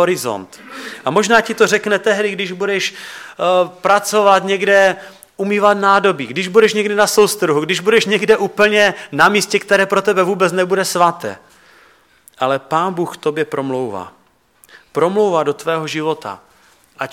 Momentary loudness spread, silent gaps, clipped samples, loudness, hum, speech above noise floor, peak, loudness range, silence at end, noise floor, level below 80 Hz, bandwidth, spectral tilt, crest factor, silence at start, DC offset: 13 LU; none; under 0.1%; -15 LUFS; none; 37 dB; 0 dBFS; 7 LU; 0 s; -52 dBFS; -60 dBFS; 16.5 kHz; -3.5 dB/octave; 16 dB; 0 s; under 0.1%